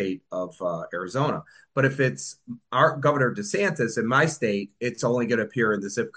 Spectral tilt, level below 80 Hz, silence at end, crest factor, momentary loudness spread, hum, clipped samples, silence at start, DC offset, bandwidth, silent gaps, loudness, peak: -5.5 dB/octave; -68 dBFS; 0.05 s; 20 dB; 10 LU; none; under 0.1%; 0 s; under 0.1%; 10 kHz; none; -25 LUFS; -6 dBFS